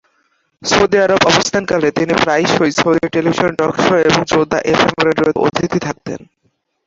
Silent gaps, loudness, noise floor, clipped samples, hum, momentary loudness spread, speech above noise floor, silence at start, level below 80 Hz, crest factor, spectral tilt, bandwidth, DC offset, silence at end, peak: none; -14 LUFS; -64 dBFS; under 0.1%; none; 7 LU; 50 dB; 0.6 s; -46 dBFS; 14 dB; -4.5 dB/octave; 8 kHz; under 0.1%; 0.65 s; 0 dBFS